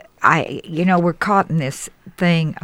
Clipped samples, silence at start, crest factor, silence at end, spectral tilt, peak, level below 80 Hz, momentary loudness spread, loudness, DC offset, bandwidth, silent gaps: under 0.1%; 0.2 s; 18 dB; 0.05 s; -6 dB/octave; 0 dBFS; -52 dBFS; 10 LU; -18 LUFS; under 0.1%; 14 kHz; none